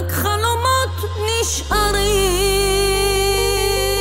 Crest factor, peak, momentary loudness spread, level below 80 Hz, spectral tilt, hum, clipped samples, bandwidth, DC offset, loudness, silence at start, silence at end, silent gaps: 14 dB; -4 dBFS; 3 LU; -26 dBFS; -3 dB/octave; none; under 0.1%; 16.5 kHz; under 0.1%; -17 LUFS; 0 s; 0 s; none